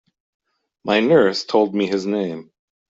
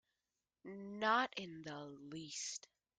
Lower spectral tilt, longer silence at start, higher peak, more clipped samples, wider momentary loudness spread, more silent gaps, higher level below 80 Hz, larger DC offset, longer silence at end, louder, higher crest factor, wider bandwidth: first, -5.5 dB/octave vs -2.5 dB/octave; first, 0.85 s vs 0.65 s; first, -4 dBFS vs -22 dBFS; neither; second, 14 LU vs 17 LU; neither; first, -62 dBFS vs -84 dBFS; neither; about the same, 0.5 s vs 0.4 s; first, -18 LUFS vs -42 LUFS; second, 16 dB vs 22 dB; second, 7.8 kHz vs 10 kHz